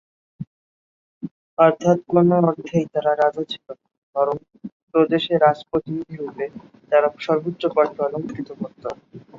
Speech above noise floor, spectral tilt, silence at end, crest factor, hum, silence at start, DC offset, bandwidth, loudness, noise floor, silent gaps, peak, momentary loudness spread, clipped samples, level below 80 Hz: over 70 dB; -7.5 dB/octave; 0.2 s; 20 dB; none; 0.4 s; under 0.1%; 7.4 kHz; -21 LUFS; under -90 dBFS; 0.47-1.21 s, 1.31-1.57 s, 3.98-4.13 s, 4.72-4.87 s; -2 dBFS; 21 LU; under 0.1%; -62 dBFS